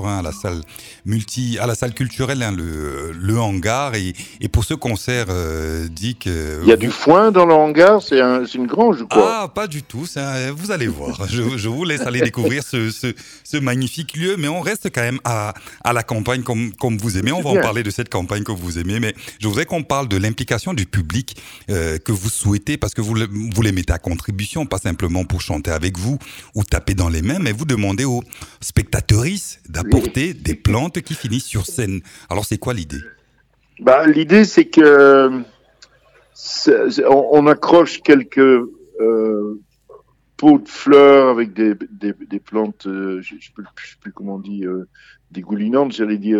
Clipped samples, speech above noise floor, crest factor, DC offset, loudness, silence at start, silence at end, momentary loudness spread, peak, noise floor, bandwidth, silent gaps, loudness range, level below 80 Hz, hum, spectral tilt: under 0.1%; 41 dB; 16 dB; under 0.1%; -17 LUFS; 0 s; 0 s; 15 LU; 0 dBFS; -58 dBFS; 17 kHz; none; 9 LU; -36 dBFS; none; -5.5 dB/octave